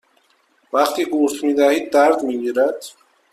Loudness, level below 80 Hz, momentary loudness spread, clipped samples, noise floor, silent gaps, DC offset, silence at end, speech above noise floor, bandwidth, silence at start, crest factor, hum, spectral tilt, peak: -18 LUFS; -66 dBFS; 7 LU; under 0.1%; -60 dBFS; none; under 0.1%; 0.45 s; 43 dB; 15 kHz; 0.75 s; 16 dB; none; -3 dB/octave; -2 dBFS